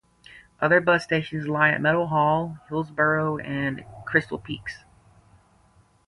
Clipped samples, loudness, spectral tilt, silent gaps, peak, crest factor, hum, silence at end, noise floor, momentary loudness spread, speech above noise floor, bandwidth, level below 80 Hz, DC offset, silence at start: under 0.1%; -23 LUFS; -7 dB/octave; none; -4 dBFS; 20 dB; none; 1.3 s; -59 dBFS; 14 LU; 36 dB; 11.5 kHz; -58 dBFS; under 0.1%; 0.3 s